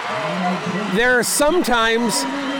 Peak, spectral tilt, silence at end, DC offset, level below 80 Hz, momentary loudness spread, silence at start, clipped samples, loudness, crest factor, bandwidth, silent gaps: -8 dBFS; -3 dB/octave; 0 s; under 0.1%; -42 dBFS; 6 LU; 0 s; under 0.1%; -18 LUFS; 10 dB; 19.5 kHz; none